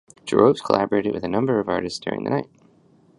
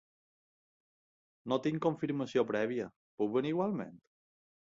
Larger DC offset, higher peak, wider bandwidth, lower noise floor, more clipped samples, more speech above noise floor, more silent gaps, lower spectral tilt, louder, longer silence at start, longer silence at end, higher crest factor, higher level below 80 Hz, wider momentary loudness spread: neither; first, 0 dBFS vs -18 dBFS; first, 11 kHz vs 7.6 kHz; second, -56 dBFS vs under -90 dBFS; neither; second, 35 dB vs over 57 dB; second, none vs 2.96-3.18 s; about the same, -6.5 dB/octave vs -7 dB/octave; first, -22 LUFS vs -34 LUFS; second, 0.25 s vs 1.45 s; about the same, 0.75 s vs 0.8 s; about the same, 22 dB vs 20 dB; first, -56 dBFS vs -76 dBFS; about the same, 9 LU vs 10 LU